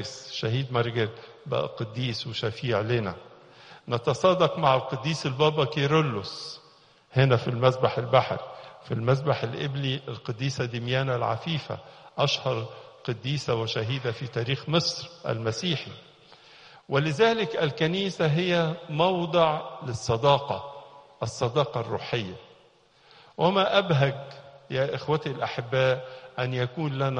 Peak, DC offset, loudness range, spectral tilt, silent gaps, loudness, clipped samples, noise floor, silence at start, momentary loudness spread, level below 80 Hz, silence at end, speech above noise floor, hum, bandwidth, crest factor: -6 dBFS; under 0.1%; 4 LU; -6 dB/octave; none; -27 LUFS; under 0.1%; -59 dBFS; 0 s; 13 LU; -60 dBFS; 0 s; 33 dB; none; 9.8 kHz; 20 dB